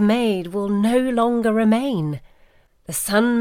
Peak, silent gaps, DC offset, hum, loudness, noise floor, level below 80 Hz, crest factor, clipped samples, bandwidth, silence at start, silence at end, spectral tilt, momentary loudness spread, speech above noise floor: -4 dBFS; none; under 0.1%; none; -20 LUFS; -54 dBFS; -52 dBFS; 14 dB; under 0.1%; 16.5 kHz; 0 s; 0 s; -5.5 dB/octave; 8 LU; 35 dB